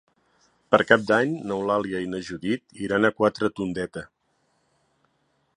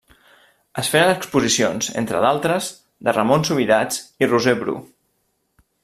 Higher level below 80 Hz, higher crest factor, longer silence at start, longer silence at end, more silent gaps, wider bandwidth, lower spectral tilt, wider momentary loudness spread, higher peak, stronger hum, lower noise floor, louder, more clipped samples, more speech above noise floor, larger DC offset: about the same, -60 dBFS vs -58 dBFS; first, 24 dB vs 18 dB; about the same, 0.7 s vs 0.75 s; first, 1.5 s vs 1 s; neither; second, 11 kHz vs 15 kHz; first, -6 dB/octave vs -4 dB/octave; first, 12 LU vs 9 LU; about the same, -2 dBFS vs -2 dBFS; neither; about the same, -70 dBFS vs -69 dBFS; second, -24 LUFS vs -19 LUFS; neither; second, 46 dB vs 50 dB; neither